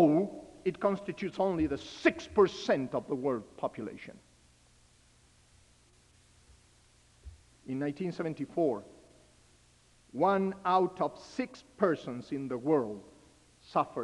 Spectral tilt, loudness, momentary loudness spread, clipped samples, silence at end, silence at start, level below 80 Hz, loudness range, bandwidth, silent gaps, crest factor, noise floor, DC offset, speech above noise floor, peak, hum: -6.5 dB/octave; -32 LUFS; 13 LU; under 0.1%; 0 s; 0 s; -64 dBFS; 12 LU; 11.5 kHz; none; 22 dB; -64 dBFS; under 0.1%; 32 dB; -10 dBFS; 60 Hz at -65 dBFS